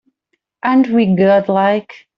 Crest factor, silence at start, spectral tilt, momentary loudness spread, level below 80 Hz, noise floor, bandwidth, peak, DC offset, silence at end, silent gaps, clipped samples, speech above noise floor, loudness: 12 dB; 0.65 s; -9 dB/octave; 7 LU; -58 dBFS; -70 dBFS; 6 kHz; -2 dBFS; under 0.1%; 0.2 s; none; under 0.1%; 56 dB; -14 LUFS